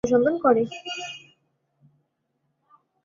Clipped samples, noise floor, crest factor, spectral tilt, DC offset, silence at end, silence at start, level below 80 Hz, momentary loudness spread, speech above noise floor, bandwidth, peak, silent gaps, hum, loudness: under 0.1%; -75 dBFS; 20 dB; -5 dB/octave; under 0.1%; 1.85 s; 0.05 s; -60 dBFS; 17 LU; 53 dB; 7.2 kHz; -6 dBFS; none; none; -23 LUFS